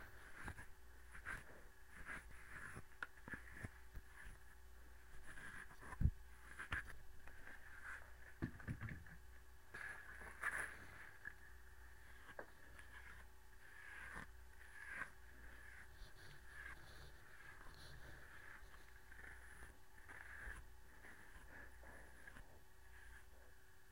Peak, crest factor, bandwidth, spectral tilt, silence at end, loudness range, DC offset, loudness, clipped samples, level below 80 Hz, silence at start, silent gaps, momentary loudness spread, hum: -22 dBFS; 32 dB; 16 kHz; -5 dB/octave; 0 s; 8 LU; under 0.1%; -55 LUFS; under 0.1%; -60 dBFS; 0 s; none; 15 LU; none